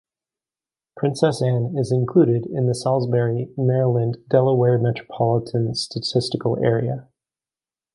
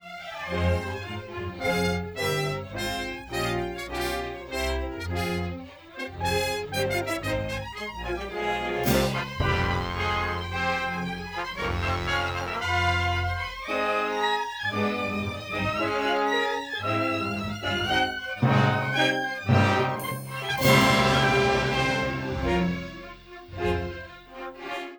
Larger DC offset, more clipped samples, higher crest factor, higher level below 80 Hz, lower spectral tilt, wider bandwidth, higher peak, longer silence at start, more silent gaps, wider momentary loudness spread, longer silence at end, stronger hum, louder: neither; neither; about the same, 18 dB vs 20 dB; second, -58 dBFS vs -44 dBFS; first, -7 dB/octave vs -5 dB/octave; second, 11.5 kHz vs over 20 kHz; first, -2 dBFS vs -6 dBFS; first, 0.95 s vs 0.05 s; neither; second, 7 LU vs 12 LU; first, 0.9 s vs 0 s; neither; first, -21 LUFS vs -26 LUFS